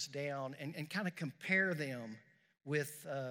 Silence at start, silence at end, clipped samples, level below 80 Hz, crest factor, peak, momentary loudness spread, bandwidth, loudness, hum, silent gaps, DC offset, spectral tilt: 0 s; 0 s; under 0.1%; under -90 dBFS; 20 dB; -20 dBFS; 15 LU; 16 kHz; -39 LUFS; none; none; under 0.1%; -5 dB/octave